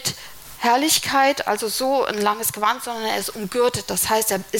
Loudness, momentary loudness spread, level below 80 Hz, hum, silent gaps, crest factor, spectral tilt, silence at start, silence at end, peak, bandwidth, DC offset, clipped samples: -20 LUFS; 8 LU; -54 dBFS; none; none; 18 dB; -2 dB/octave; 0 s; 0 s; -4 dBFS; 17 kHz; under 0.1%; under 0.1%